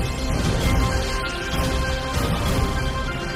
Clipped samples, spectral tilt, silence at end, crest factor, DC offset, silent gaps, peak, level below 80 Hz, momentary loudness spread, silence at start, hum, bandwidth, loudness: under 0.1%; -5 dB/octave; 0 s; 12 dB; under 0.1%; none; -10 dBFS; -26 dBFS; 4 LU; 0 s; none; 16 kHz; -23 LUFS